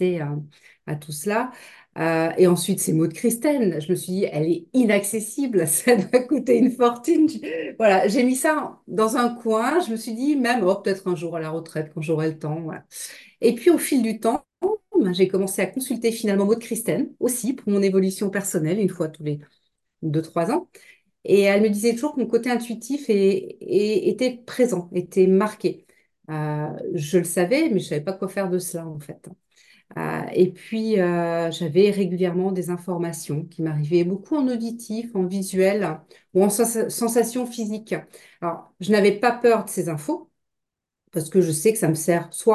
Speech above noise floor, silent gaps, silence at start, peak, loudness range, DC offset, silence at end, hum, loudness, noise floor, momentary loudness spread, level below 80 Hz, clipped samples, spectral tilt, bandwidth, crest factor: 62 dB; none; 0 s; -4 dBFS; 5 LU; under 0.1%; 0 s; none; -22 LUFS; -83 dBFS; 12 LU; -68 dBFS; under 0.1%; -5.5 dB/octave; 13 kHz; 18 dB